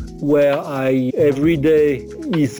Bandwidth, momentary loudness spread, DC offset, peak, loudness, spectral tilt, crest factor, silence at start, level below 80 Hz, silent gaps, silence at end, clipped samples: over 20 kHz; 5 LU; under 0.1%; -6 dBFS; -17 LUFS; -7.5 dB/octave; 10 dB; 0 s; -42 dBFS; none; 0 s; under 0.1%